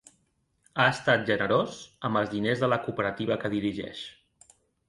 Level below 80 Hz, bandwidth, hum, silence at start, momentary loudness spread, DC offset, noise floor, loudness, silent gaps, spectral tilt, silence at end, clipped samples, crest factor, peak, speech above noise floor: -62 dBFS; 11.5 kHz; none; 0.75 s; 12 LU; under 0.1%; -72 dBFS; -27 LUFS; none; -5.5 dB/octave; 0.8 s; under 0.1%; 20 dB; -8 dBFS; 45 dB